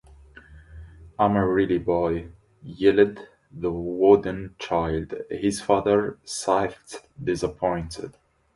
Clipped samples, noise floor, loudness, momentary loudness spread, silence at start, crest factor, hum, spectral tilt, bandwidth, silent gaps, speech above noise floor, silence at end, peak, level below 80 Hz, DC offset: under 0.1%; -49 dBFS; -24 LUFS; 18 LU; 0.5 s; 20 dB; none; -6 dB/octave; 11.5 kHz; none; 26 dB; 0.45 s; -4 dBFS; -48 dBFS; under 0.1%